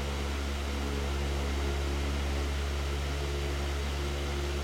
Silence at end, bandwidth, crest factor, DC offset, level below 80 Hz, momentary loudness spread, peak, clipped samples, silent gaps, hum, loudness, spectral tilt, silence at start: 0 s; 15.5 kHz; 12 dB; 0.1%; -34 dBFS; 2 LU; -20 dBFS; under 0.1%; none; none; -33 LUFS; -5 dB/octave; 0 s